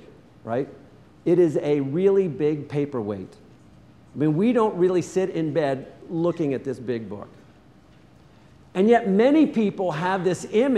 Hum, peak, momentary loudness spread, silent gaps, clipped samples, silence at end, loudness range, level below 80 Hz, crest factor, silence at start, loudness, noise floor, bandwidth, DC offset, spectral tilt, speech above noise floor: none; -6 dBFS; 14 LU; none; under 0.1%; 0 s; 5 LU; -62 dBFS; 18 dB; 0.45 s; -23 LUFS; -52 dBFS; 11.5 kHz; under 0.1%; -7.5 dB/octave; 30 dB